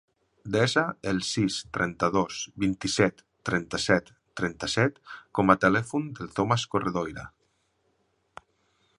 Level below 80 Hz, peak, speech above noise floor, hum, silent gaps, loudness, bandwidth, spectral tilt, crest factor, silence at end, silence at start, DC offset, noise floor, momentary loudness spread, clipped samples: -54 dBFS; -4 dBFS; 45 dB; none; none; -27 LUFS; 11.5 kHz; -4.5 dB/octave; 24 dB; 1.7 s; 0.45 s; under 0.1%; -72 dBFS; 11 LU; under 0.1%